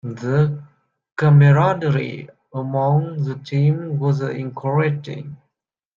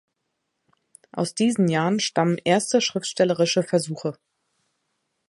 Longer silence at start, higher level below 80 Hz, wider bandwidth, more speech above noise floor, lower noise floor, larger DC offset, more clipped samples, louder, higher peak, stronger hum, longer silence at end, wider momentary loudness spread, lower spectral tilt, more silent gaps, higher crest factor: second, 0.05 s vs 1.15 s; first, -56 dBFS vs -70 dBFS; second, 7 kHz vs 11.5 kHz; first, 61 dB vs 55 dB; about the same, -79 dBFS vs -77 dBFS; neither; neither; first, -19 LUFS vs -22 LUFS; about the same, -4 dBFS vs -6 dBFS; neither; second, 0.6 s vs 1.15 s; first, 19 LU vs 9 LU; first, -9 dB/octave vs -4.5 dB/octave; neither; about the same, 16 dB vs 20 dB